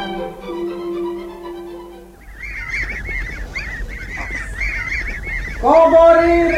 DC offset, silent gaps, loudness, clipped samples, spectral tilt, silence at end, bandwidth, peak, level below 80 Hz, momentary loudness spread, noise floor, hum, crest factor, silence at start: under 0.1%; none; -17 LUFS; under 0.1%; -6 dB/octave; 0 s; 13 kHz; 0 dBFS; -30 dBFS; 21 LU; -38 dBFS; none; 18 dB; 0 s